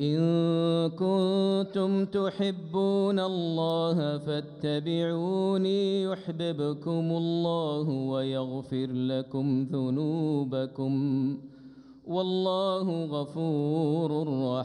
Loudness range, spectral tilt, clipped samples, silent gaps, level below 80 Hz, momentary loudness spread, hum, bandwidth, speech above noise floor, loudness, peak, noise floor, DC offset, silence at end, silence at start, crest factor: 3 LU; -8 dB/octave; under 0.1%; none; -72 dBFS; 7 LU; none; 10 kHz; 22 dB; -29 LUFS; -16 dBFS; -50 dBFS; under 0.1%; 0 s; 0 s; 12 dB